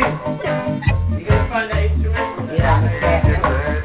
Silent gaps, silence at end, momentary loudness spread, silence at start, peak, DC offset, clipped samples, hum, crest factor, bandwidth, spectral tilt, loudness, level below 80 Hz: none; 0 s; 6 LU; 0 s; -2 dBFS; under 0.1%; under 0.1%; none; 14 dB; 4.7 kHz; -12 dB/octave; -18 LUFS; -24 dBFS